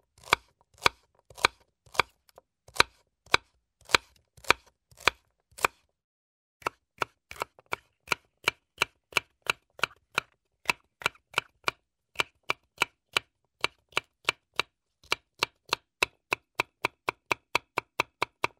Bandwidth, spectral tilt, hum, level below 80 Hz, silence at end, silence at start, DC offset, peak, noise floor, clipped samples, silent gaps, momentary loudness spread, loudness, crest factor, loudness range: 16 kHz; -1 dB/octave; none; -60 dBFS; 0.55 s; 0.3 s; under 0.1%; -4 dBFS; -64 dBFS; under 0.1%; 6.04-6.60 s; 9 LU; -31 LUFS; 30 dB; 5 LU